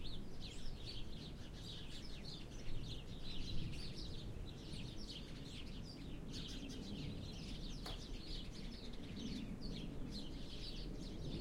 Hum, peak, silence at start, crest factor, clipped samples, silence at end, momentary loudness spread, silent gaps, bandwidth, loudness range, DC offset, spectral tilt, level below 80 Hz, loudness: none; -30 dBFS; 0 s; 16 dB; under 0.1%; 0 s; 4 LU; none; 12.5 kHz; 1 LU; under 0.1%; -5 dB/octave; -50 dBFS; -50 LUFS